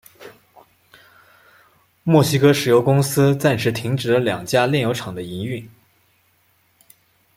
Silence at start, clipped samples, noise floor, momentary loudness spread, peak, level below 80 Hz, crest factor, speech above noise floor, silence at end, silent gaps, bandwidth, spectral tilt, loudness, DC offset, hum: 0.2 s; under 0.1%; -61 dBFS; 13 LU; -2 dBFS; -58 dBFS; 18 dB; 44 dB; 1.7 s; none; 16.5 kHz; -6 dB/octave; -18 LUFS; under 0.1%; none